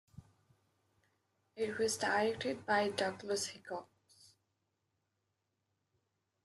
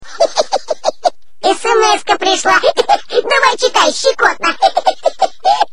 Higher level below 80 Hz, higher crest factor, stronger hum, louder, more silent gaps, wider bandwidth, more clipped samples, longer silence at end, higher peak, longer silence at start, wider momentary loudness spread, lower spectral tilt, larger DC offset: second, -78 dBFS vs -52 dBFS; first, 20 dB vs 14 dB; neither; second, -36 LUFS vs -13 LUFS; neither; about the same, 12.5 kHz vs 13 kHz; neither; first, 2.6 s vs 0.1 s; second, -20 dBFS vs 0 dBFS; first, 0.15 s vs 0 s; first, 11 LU vs 6 LU; first, -3 dB/octave vs -0.5 dB/octave; second, under 0.1% vs 4%